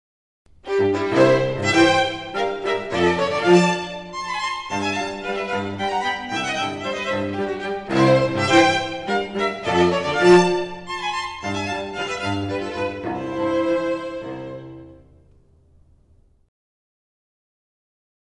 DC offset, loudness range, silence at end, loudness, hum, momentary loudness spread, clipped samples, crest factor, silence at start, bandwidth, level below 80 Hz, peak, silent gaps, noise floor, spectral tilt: under 0.1%; 9 LU; 3.3 s; -21 LUFS; none; 12 LU; under 0.1%; 18 dB; 0.65 s; 11.5 kHz; -50 dBFS; -4 dBFS; none; -56 dBFS; -5 dB/octave